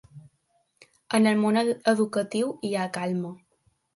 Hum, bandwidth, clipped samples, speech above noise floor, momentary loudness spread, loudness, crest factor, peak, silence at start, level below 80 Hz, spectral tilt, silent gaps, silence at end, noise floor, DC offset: none; 11.5 kHz; under 0.1%; 46 dB; 8 LU; -25 LUFS; 18 dB; -8 dBFS; 0.15 s; -72 dBFS; -5.5 dB/octave; none; 0.6 s; -70 dBFS; under 0.1%